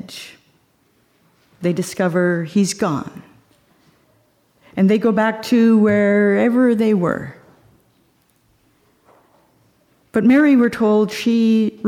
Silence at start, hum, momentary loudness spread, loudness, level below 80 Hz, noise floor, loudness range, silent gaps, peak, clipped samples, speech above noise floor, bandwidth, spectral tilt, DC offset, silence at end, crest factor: 0.05 s; none; 14 LU; -16 LUFS; -60 dBFS; -60 dBFS; 7 LU; none; -4 dBFS; under 0.1%; 45 dB; 14.5 kHz; -6.5 dB/octave; under 0.1%; 0 s; 14 dB